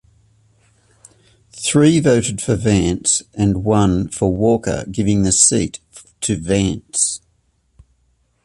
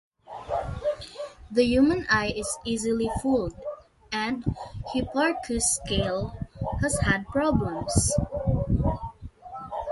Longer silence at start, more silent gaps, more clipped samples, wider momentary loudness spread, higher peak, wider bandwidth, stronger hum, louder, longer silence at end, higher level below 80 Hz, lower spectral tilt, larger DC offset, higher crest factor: first, 1.55 s vs 0.3 s; neither; neither; second, 10 LU vs 15 LU; first, 0 dBFS vs -6 dBFS; about the same, 11.5 kHz vs 11.5 kHz; neither; first, -16 LUFS vs -26 LUFS; first, 1.3 s vs 0 s; about the same, -38 dBFS vs -38 dBFS; about the same, -4.5 dB/octave vs -4.5 dB/octave; neither; about the same, 18 dB vs 20 dB